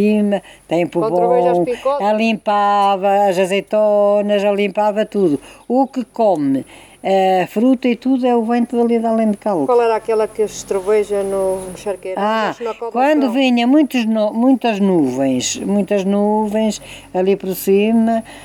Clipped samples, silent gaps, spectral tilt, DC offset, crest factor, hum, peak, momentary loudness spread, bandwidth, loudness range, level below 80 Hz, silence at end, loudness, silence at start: under 0.1%; none; -5.5 dB/octave; under 0.1%; 12 dB; none; -4 dBFS; 7 LU; 17.5 kHz; 2 LU; -54 dBFS; 0 s; -16 LUFS; 0 s